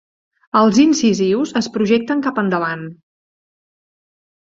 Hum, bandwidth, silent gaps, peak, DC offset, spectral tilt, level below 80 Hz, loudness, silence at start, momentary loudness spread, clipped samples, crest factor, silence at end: none; 7.8 kHz; none; -2 dBFS; under 0.1%; -5 dB/octave; -58 dBFS; -16 LUFS; 0.55 s; 9 LU; under 0.1%; 16 dB; 1.45 s